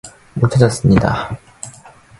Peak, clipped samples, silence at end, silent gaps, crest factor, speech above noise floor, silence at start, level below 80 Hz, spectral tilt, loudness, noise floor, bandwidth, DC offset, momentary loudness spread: 0 dBFS; under 0.1%; 0.3 s; none; 16 dB; 29 dB; 0.05 s; -36 dBFS; -6.5 dB/octave; -15 LUFS; -42 dBFS; 11.5 kHz; under 0.1%; 20 LU